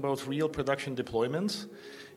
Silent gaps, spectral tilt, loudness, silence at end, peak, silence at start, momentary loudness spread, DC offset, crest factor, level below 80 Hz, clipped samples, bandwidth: none; -5.5 dB/octave; -32 LUFS; 0 s; -14 dBFS; 0 s; 10 LU; under 0.1%; 18 dB; -60 dBFS; under 0.1%; 16 kHz